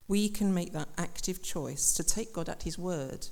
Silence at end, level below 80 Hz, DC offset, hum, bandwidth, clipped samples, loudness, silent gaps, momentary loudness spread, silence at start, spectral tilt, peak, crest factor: 0 s; -46 dBFS; under 0.1%; none; 18 kHz; under 0.1%; -32 LUFS; none; 10 LU; 0 s; -4 dB/octave; -12 dBFS; 20 dB